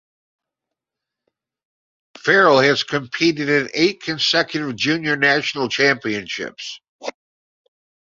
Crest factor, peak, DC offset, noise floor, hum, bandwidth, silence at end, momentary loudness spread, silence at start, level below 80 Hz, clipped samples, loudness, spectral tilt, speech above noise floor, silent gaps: 20 dB; -2 dBFS; under 0.1%; -85 dBFS; none; 7.6 kHz; 1 s; 18 LU; 2.25 s; -64 dBFS; under 0.1%; -18 LUFS; -4 dB/octave; 67 dB; 6.89-6.99 s